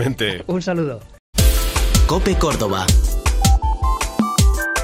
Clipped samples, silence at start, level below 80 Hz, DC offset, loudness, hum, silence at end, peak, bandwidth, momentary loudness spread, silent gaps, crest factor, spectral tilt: under 0.1%; 0 s; -20 dBFS; under 0.1%; -18 LUFS; none; 0 s; 0 dBFS; 16 kHz; 6 LU; 1.19-1.33 s; 16 dB; -4.5 dB/octave